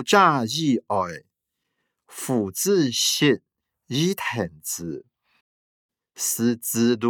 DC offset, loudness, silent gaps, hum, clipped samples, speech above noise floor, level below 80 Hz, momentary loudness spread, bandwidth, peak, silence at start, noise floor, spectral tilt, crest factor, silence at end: under 0.1%; -23 LUFS; 5.41-5.89 s; none; under 0.1%; 58 dB; -70 dBFS; 13 LU; over 20 kHz; -2 dBFS; 0 s; -80 dBFS; -3.5 dB/octave; 22 dB; 0 s